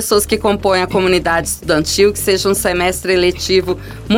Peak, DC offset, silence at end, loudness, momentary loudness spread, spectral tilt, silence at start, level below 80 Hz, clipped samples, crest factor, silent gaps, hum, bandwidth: -2 dBFS; under 0.1%; 0 s; -14 LUFS; 3 LU; -3.5 dB/octave; 0 s; -34 dBFS; under 0.1%; 12 dB; none; none; 17.5 kHz